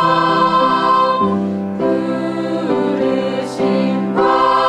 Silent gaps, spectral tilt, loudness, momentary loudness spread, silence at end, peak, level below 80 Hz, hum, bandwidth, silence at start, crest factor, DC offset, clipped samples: none; -6.5 dB/octave; -16 LUFS; 7 LU; 0 s; -2 dBFS; -54 dBFS; none; 11 kHz; 0 s; 14 dB; under 0.1%; under 0.1%